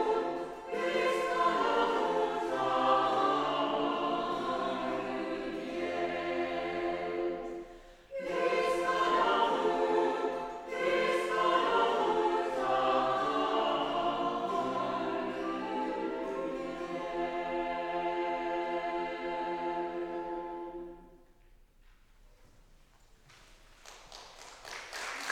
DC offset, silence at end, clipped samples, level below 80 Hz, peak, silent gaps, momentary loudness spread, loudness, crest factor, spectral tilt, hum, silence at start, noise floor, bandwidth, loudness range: under 0.1%; 0 s; under 0.1%; -62 dBFS; -14 dBFS; none; 11 LU; -32 LUFS; 18 dB; -4 dB/octave; none; 0 s; -61 dBFS; 14 kHz; 10 LU